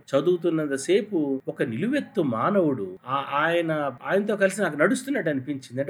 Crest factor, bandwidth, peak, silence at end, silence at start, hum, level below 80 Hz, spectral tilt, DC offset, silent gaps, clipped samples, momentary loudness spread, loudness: 18 dB; 16 kHz; -6 dBFS; 0 s; 0.1 s; none; -78 dBFS; -5.5 dB/octave; under 0.1%; none; under 0.1%; 6 LU; -25 LUFS